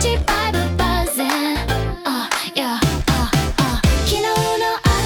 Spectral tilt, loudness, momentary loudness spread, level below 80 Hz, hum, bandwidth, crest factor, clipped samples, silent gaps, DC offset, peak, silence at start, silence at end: -4.5 dB/octave; -19 LUFS; 3 LU; -26 dBFS; none; 18 kHz; 16 dB; under 0.1%; none; under 0.1%; -2 dBFS; 0 s; 0 s